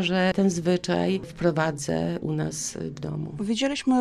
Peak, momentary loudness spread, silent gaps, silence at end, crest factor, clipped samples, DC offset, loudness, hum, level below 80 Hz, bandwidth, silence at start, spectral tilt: -10 dBFS; 9 LU; none; 0 s; 16 dB; under 0.1%; under 0.1%; -26 LUFS; none; -54 dBFS; 13.5 kHz; 0 s; -5 dB/octave